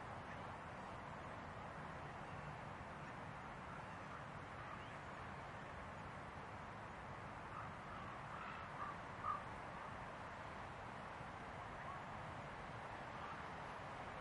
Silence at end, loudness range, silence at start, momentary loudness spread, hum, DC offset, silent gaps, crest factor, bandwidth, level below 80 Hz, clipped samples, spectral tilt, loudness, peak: 0 s; 2 LU; 0 s; 3 LU; none; under 0.1%; none; 18 dB; 11 kHz; -66 dBFS; under 0.1%; -5.5 dB/octave; -51 LUFS; -34 dBFS